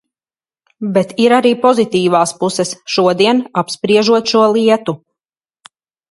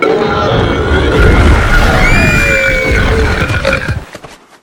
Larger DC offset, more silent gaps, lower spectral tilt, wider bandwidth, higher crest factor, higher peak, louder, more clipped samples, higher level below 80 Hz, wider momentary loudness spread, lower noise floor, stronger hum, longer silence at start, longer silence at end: neither; neither; about the same, -4.5 dB/octave vs -5.5 dB/octave; second, 11.5 kHz vs 19 kHz; about the same, 14 dB vs 10 dB; about the same, 0 dBFS vs 0 dBFS; second, -13 LUFS vs -10 LUFS; second, under 0.1% vs 0.5%; second, -62 dBFS vs -14 dBFS; first, 8 LU vs 5 LU; first, under -90 dBFS vs -32 dBFS; neither; first, 0.8 s vs 0 s; first, 1.15 s vs 0.3 s